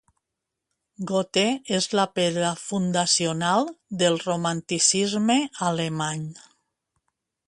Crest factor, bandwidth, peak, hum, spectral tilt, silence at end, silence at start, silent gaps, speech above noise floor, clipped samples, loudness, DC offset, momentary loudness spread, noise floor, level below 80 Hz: 20 dB; 11.5 kHz; -6 dBFS; none; -3.5 dB/octave; 1.1 s; 1 s; none; 60 dB; under 0.1%; -23 LUFS; under 0.1%; 7 LU; -84 dBFS; -66 dBFS